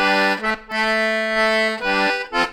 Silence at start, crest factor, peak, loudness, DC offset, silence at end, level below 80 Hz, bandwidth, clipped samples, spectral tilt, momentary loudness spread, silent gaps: 0 s; 16 dB; -4 dBFS; -19 LUFS; under 0.1%; 0 s; -48 dBFS; 19.5 kHz; under 0.1%; -3.5 dB/octave; 4 LU; none